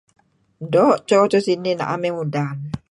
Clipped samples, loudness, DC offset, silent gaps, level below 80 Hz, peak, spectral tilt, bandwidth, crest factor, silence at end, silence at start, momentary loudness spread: under 0.1%; -19 LUFS; under 0.1%; none; -56 dBFS; -2 dBFS; -6.5 dB/octave; 11 kHz; 16 dB; 0.15 s; 0.6 s; 10 LU